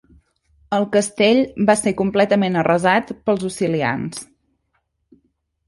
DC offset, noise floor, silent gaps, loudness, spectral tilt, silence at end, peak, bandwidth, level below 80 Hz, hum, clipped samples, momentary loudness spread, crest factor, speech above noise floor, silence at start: under 0.1%; -70 dBFS; none; -18 LUFS; -5 dB/octave; 1.45 s; -2 dBFS; 11.5 kHz; -54 dBFS; none; under 0.1%; 7 LU; 16 dB; 52 dB; 0.7 s